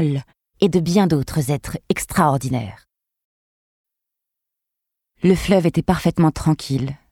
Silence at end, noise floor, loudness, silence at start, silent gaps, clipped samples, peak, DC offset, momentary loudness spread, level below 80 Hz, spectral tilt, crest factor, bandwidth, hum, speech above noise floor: 0.15 s; -83 dBFS; -19 LUFS; 0 s; 3.24-3.85 s; under 0.1%; -2 dBFS; under 0.1%; 8 LU; -42 dBFS; -6.5 dB/octave; 18 dB; 17 kHz; none; 64 dB